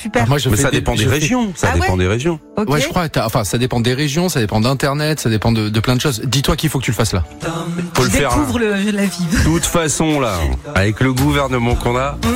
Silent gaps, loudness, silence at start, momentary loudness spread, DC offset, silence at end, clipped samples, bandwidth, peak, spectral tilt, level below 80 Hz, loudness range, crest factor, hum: none; -16 LUFS; 0 s; 4 LU; under 0.1%; 0 s; under 0.1%; 16 kHz; -4 dBFS; -5 dB/octave; -30 dBFS; 1 LU; 12 dB; none